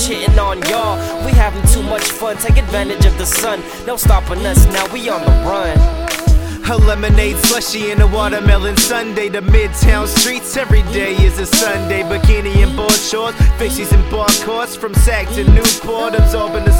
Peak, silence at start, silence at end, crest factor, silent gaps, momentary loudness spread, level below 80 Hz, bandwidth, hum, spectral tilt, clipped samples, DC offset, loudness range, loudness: 0 dBFS; 0 s; 0 s; 12 dB; none; 6 LU; -14 dBFS; 17.5 kHz; none; -4 dB/octave; under 0.1%; under 0.1%; 1 LU; -14 LUFS